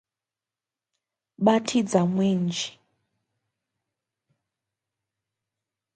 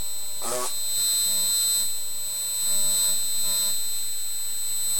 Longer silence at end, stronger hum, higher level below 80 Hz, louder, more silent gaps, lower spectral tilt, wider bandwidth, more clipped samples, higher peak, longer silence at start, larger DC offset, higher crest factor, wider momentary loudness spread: first, 3.25 s vs 0 s; neither; second, -74 dBFS vs -60 dBFS; about the same, -24 LUFS vs -23 LUFS; neither; first, -5.5 dB/octave vs 1 dB/octave; second, 9.4 kHz vs over 20 kHz; neither; first, -6 dBFS vs -12 dBFS; first, 1.4 s vs 0 s; second, under 0.1% vs 5%; first, 24 dB vs 14 dB; about the same, 8 LU vs 8 LU